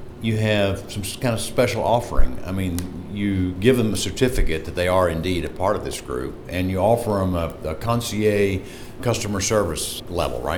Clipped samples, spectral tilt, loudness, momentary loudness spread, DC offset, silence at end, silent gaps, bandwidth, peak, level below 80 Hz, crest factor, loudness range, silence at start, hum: under 0.1%; -5 dB/octave; -23 LUFS; 9 LU; under 0.1%; 0 s; none; 18.5 kHz; -2 dBFS; -30 dBFS; 20 dB; 1 LU; 0 s; none